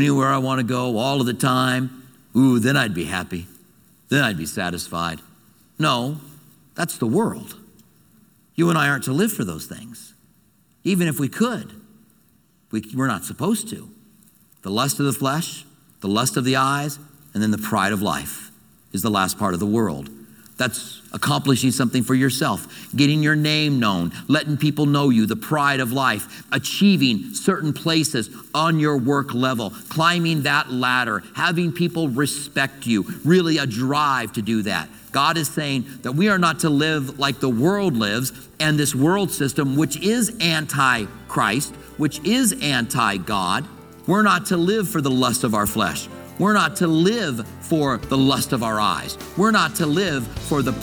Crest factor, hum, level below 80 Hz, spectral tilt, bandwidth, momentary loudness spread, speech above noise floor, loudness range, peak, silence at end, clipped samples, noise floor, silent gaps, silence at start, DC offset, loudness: 18 dB; none; -52 dBFS; -4.5 dB/octave; 19 kHz; 10 LU; 39 dB; 5 LU; -2 dBFS; 0 s; under 0.1%; -59 dBFS; none; 0 s; under 0.1%; -20 LUFS